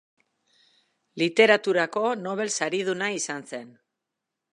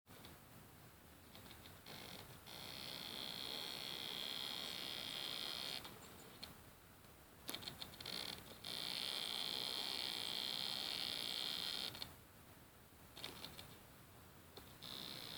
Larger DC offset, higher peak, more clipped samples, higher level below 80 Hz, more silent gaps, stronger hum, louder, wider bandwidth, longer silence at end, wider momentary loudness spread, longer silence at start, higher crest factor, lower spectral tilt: neither; first, -4 dBFS vs -22 dBFS; neither; second, -82 dBFS vs -74 dBFS; neither; neither; first, -24 LUFS vs -45 LUFS; second, 11.5 kHz vs over 20 kHz; first, 0.85 s vs 0 s; about the same, 17 LU vs 19 LU; first, 1.15 s vs 0.05 s; about the same, 24 dB vs 28 dB; first, -3 dB/octave vs -1.5 dB/octave